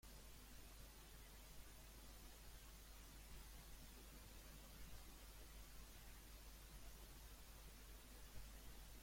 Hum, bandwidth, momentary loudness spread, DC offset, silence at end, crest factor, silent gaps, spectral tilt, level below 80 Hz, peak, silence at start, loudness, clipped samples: none; 16.5 kHz; 1 LU; under 0.1%; 0 s; 16 dB; none; -3 dB/octave; -62 dBFS; -44 dBFS; 0.05 s; -61 LUFS; under 0.1%